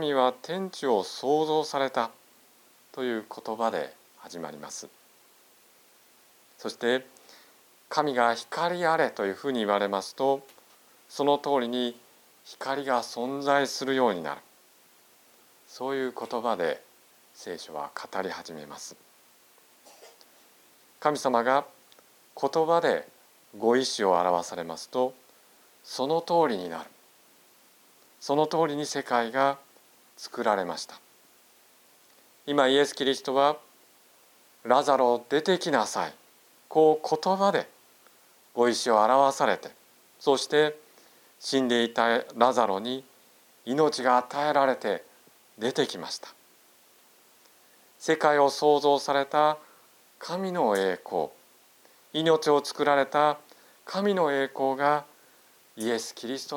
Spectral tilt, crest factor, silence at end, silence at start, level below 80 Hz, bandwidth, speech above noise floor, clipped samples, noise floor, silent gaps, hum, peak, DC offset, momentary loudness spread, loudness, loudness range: -4 dB/octave; 24 dB; 0 s; 0 s; -82 dBFS; 19.5 kHz; 33 dB; under 0.1%; -59 dBFS; none; none; -4 dBFS; under 0.1%; 15 LU; -27 LUFS; 9 LU